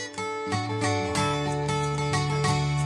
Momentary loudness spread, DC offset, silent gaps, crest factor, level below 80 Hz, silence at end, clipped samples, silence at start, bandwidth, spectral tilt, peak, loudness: 4 LU; under 0.1%; none; 14 dB; -48 dBFS; 0 s; under 0.1%; 0 s; 11.5 kHz; -5 dB/octave; -12 dBFS; -27 LUFS